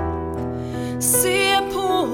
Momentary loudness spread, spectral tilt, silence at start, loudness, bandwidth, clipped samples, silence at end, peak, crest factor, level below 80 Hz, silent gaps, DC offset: 11 LU; -3 dB/octave; 0 s; -20 LUFS; 19.5 kHz; under 0.1%; 0 s; -4 dBFS; 18 dB; -40 dBFS; none; under 0.1%